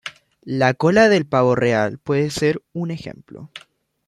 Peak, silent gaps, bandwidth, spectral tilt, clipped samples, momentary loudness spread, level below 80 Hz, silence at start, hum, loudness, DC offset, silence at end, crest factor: -2 dBFS; none; 13.5 kHz; -6 dB/octave; under 0.1%; 23 LU; -56 dBFS; 0.05 s; none; -18 LUFS; under 0.1%; 0.5 s; 18 dB